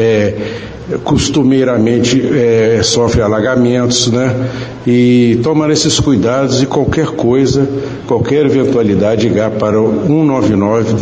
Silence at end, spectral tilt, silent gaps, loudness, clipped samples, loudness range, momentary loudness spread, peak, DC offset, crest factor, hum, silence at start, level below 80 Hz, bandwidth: 0 s; -5.5 dB/octave; none; -11 LUFS; under 0.1%; 1 LU; 6 LU; 0 dBFS; under 0.1%; 10 dB; none; 0 s; -34 dBFS; 9.8 kHz